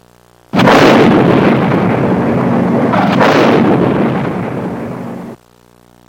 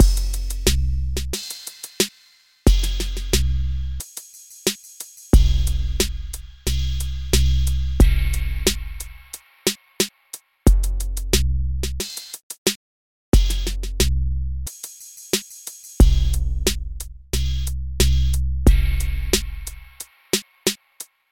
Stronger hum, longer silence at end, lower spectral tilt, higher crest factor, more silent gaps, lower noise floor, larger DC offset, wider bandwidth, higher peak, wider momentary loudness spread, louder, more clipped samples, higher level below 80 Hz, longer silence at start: first, 60 Hz at -35 dBFS vs none; first, 0.75 s vs 0 s; first, -7 dB/octave vs -4 dB/octave; second, 10 dB vs 18 dB; second, none vs 12.43-12.50 s, 12.58-12.66 s, 12.76-13.32 s; second, -45 dBFS vs -55 dBFS; neither; about the same, 17 kHz vs 17 kHz; about the same, 0 dBFS vs -2 dBFS; about the same, 15 LU vs 16 LU; first, -10 LUFS vs -23 LUFS; first, 0.3% vs under 0.1%; second, -42 dBFS vs -22 dBFS; first, 0.55 s vs 0 s